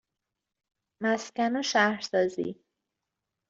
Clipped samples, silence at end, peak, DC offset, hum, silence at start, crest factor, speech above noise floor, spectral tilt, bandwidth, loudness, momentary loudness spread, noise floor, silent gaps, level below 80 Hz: under 0.1%; 0.95 s; -8 dBFS; under 0.1%; none; 1 s; 22 dB; 59 dB; -3.5 dB/octave; 7.8 kHz; -28 LUFS; 9 LU; -86 dBFS; none; -74 dBFS